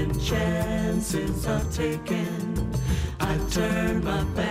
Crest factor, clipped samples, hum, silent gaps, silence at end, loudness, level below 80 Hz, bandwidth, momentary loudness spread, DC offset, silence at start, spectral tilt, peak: 12 dB; under 0.1%; none; none; 0 s; -26 LUFS; -34 dBFS; 16 kHz; 3 LU; under 0.1%; 0 s; -5.5 dB/octave; -12 dBFS